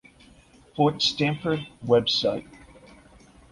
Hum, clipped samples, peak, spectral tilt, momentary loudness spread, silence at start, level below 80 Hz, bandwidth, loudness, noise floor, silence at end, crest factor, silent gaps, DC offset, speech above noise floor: none; under 0.1%; -8 dBFS; -5 dB/octave; 10 LU; 0.75 s; -56 dBFS; 11.5 kHz; -24 LUFS; -54 dBFS; 1.1 s; 20 dB; none; under 0.1%; 30 dB